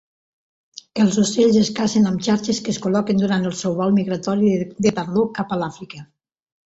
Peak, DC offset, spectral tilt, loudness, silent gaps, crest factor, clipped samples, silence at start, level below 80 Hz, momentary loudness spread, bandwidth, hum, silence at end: -4 dBFS; under 0.1%; -5.5 dB/octave; -19 LUFS; none; 14 dB; under 0.1%; 0.95 s; -56 dBFS; 9 LU; 8 kHz; none; 0.65 s